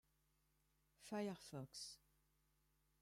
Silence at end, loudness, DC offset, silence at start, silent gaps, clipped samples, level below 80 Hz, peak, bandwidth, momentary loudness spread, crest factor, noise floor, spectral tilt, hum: 1.05 s; -51 LUFS; under 0.1%; 1 s; none; under 0.1%; -84 dBFS; -36 dBFS; 16 kHz; 15 LU; 20 dB; -83 dBFS; -4.5 dB/octave; none